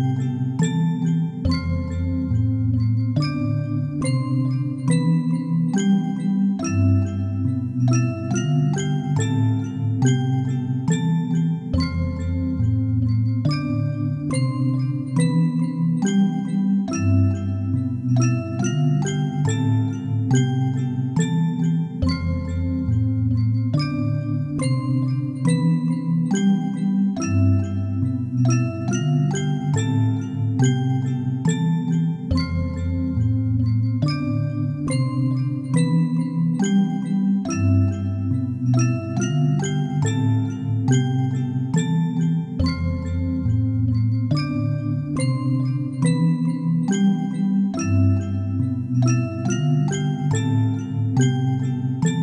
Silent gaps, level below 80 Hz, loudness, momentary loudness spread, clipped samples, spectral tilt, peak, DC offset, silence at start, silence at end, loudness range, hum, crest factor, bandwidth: none; -42 dBFS; -22 LUFS; 4 LU; under 0.1%; -7 dB/octave; -8 dBFS; under 0.1%; 0 s; 0 s; 1 LU; none; 12 dB; 10.5 kHz